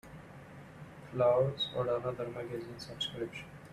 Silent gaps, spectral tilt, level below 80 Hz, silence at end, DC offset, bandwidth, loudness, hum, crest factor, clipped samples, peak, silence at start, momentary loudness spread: none; -6 dB/octave; -64 dBFS; 0 s; under 0.1%; 14 kHz; -34 LUFS; none; 18 dB; under 0.1%; -18 dBFS; 0.05 s; 22 LU